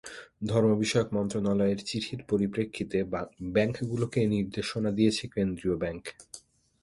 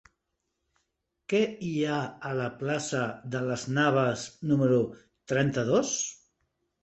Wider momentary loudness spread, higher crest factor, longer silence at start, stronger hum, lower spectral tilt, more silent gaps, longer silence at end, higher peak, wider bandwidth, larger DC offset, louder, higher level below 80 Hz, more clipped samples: about the same, 11 LU vs 9 LU; about the same, 18 dB vs 18 dB; second, 0.05 s vs 1.3 s; neither; about the same, -6 dB/octave vs -5 dB/octave; neither; second, 0.45 s vs 0.7 s; about the same, -12 dBFS vs -12 dBFS; first, 11.5 kHz vs 8.4 kHz; neither; about the same, -29 LUFS vs -28 LUFS; first, -54 dBFS vs -66 dBFS; neither